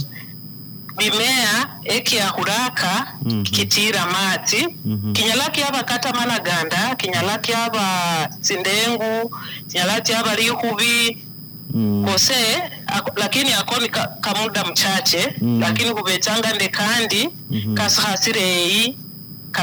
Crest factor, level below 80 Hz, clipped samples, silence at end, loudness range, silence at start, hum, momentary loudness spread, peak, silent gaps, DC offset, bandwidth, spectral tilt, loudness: 14 dB; -60 dBFS; under 0.1%; 0 s; 2 LU; 0 s; none; 9 LU; -6 dBFS; none; under 0.1%; over 20 kHz; -2.5 dB/octave; -18 LUFS